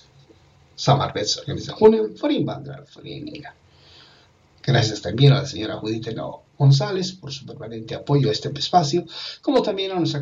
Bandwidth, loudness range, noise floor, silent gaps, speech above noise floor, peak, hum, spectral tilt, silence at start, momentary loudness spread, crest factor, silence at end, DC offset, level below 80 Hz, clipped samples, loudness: 7.6 kHz; 3 LU; -55 dBFS; none; 34 dB; -4 dBFS; none; -6 dB/octave; 0.8 s; 18 LU; 18 dB; 0 s; under 0.1%; -56 dBFS; under 0.1%; -21 LUFS